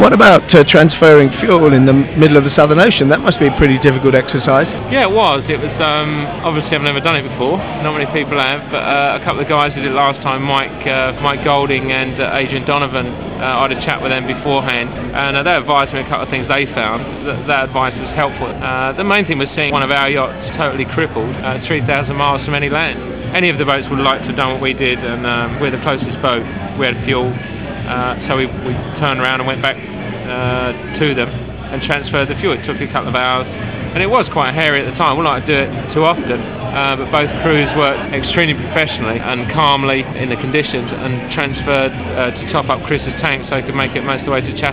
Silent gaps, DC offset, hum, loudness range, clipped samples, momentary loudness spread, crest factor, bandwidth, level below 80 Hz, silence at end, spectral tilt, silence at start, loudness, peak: none; 0.5%; none; 7 LU; 0.2%; 10 LU; 14 dB; 4 kHz; -36 dBFS; 0 s; -9.5 dB/octave; 0 s; -14 LUFS; 0 dBFS